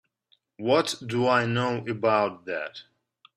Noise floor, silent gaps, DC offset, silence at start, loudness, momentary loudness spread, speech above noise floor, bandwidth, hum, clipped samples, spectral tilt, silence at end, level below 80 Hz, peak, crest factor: -69 dBFS; none; under 0.1%; 0.6 s; -26 LUFS; 11 LU; 43 dB; 14 kHz; none; under 0.1%; -5 dB/octave; 0.55 s; -68 dBFS; -6 dBFS; 20 dB